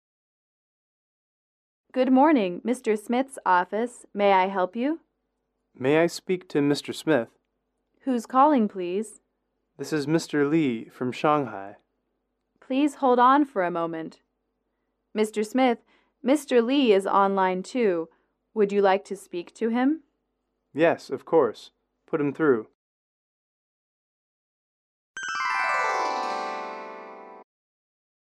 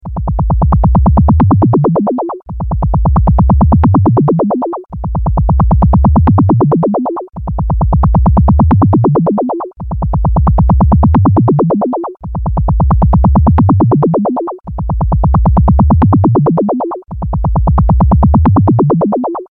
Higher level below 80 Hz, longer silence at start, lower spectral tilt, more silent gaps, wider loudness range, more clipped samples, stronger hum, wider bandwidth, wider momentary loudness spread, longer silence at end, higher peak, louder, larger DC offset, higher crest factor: second, -76 dBFS vs -16 dBFS; first, 1.95 s vs 0.05 s; second, -5.5 dB/octave vs -14 dB/octave; first, 22.75-25.14 s vs none; first, 6 LU vs 1 LU; neither; neither; first, 13.5 kHz vs 2.8 kHz; first, 15 LU vs 10 LU; first, 0.9 s vs 0.05 s; second, -8 dBFS vs 0 dBFS; second, -24 LUFS vs -11 LUFS; neither; first, 18 dB vs 8 dB